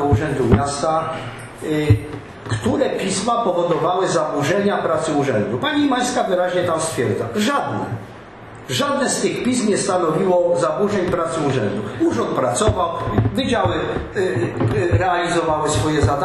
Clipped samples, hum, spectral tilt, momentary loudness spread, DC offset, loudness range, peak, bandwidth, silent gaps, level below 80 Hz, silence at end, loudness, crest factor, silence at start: under 0.1%; none; -5.5 dB/octave; 6 LU; under 0.1%; 2 LU; 0 dBFS; 13 kHz; none; -38 dBFS; 0 s; -19 LUFS; 18 dB; 0 s